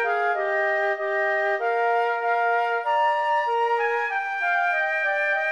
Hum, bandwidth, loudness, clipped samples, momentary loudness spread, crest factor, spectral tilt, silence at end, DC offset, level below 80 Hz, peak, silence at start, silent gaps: none; 11 kHz; -23 LUFS; under 0.1%; 2 LU; 10 dB; -1 dB/octave; 0 s; under 0.1%; -80 dBFS; -12 dBFS; 0 s; none